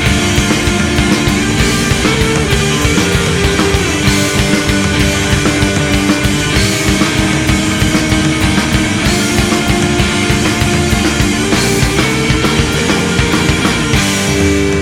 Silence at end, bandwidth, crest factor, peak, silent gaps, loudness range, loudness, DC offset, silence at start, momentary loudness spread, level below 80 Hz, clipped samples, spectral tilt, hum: 0 s; 17.5 kHz; 12 dB; 0 dBFS; none; 0 LU; -11 LUFS; 0.3%; 0 s; 1 LU; -22 dBFS; under 0.1%; -4 dB/octave; none